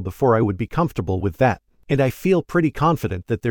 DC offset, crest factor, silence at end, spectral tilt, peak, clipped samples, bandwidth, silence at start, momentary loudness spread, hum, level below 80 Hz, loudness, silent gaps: under 0.1%; 16 dB; 0 s; -8 dB/octave; -4 dBFS; under 0.1%; 19.5 kHz; 0 s; 6 LU; none; -42 dBFS; -21 LUFS; none